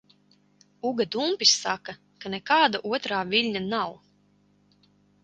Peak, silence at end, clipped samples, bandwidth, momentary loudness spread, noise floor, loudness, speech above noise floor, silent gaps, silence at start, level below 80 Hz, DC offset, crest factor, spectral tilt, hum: -6 dBFS; 1.3 s; under 0.1%; 11 kHz; 15 LU; -64 dBFS; -25 LUFS; 38 dB; none; 0.85 s; -70 dBFS; under 0.1%; 22 dB; -2 dB/octave; 50 Hz at -55 dBFS